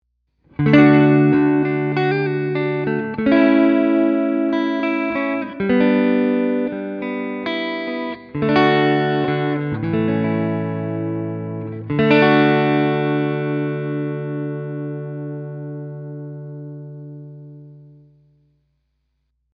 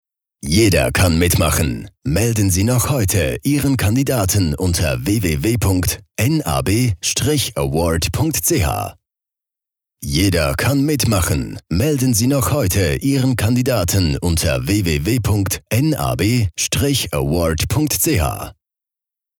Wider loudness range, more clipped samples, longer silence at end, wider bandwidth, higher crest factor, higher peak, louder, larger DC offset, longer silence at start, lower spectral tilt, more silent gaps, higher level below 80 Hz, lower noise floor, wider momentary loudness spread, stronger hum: first, 15 LU vs 3 LU; neither; first, 1.75 s vs 0.85 s; second, 5.4 kHz vs 20 kHz; about the same, 18 dB vs 14 dB; first, 0 dBFS vs -4 dBFS; about the same, -18 LUFS vs -17 LUFS; neither; first, 0.6 s vs 0.45 s; first, -9 dB/octave vs -5 dB/octave; neither; second, -54 dBFS vs -32 dBFS; second, -70 dBFS vs -87 dBFS; first, 17 LU vs 4 LU; neither